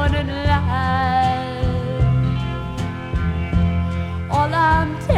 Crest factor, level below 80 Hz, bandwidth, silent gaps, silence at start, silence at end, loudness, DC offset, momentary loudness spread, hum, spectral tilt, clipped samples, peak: 16 dB; -28 dBFS; 10.5 kHz; none; 0 s; 0 s; -20 LUFS; under 0.1%; 8 LU; none; -7.5 dB/octave; under 0.1%; -4 dBFS